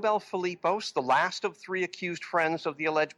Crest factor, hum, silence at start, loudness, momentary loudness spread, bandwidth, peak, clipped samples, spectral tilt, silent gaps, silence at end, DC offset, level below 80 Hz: 16 dB; none; 0 s; -29 LUFS; 7 LU; 12 kHz; -14 dBFS; under 0.1%; -4 dB/octave; none; 0.05 s; under 0.1%; -80 dBFS